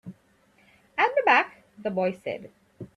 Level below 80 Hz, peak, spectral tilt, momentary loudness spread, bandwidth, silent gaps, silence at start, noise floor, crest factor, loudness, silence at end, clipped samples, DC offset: -70 dBFS; -6 dBFS; -5.5 dB/octave; 19 LU; 11.5 kHz; none; 0.05 s; -62 dBFS; 20 dB; -25 LUFS; 0.1 s; under 0.1%; under 0.1%